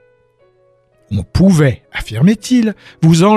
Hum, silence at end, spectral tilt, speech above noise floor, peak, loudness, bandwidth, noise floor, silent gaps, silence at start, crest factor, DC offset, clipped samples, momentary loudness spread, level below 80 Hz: none; 0 s; -6.5 dB/octave; 42 dB; 0 dBFS; -14 LUFS; 13.5 kHz; -54 dBFS; none; 1.1 s; 12 dB; under 0.1%; under 0.1%; 13 LU; -34 dBFS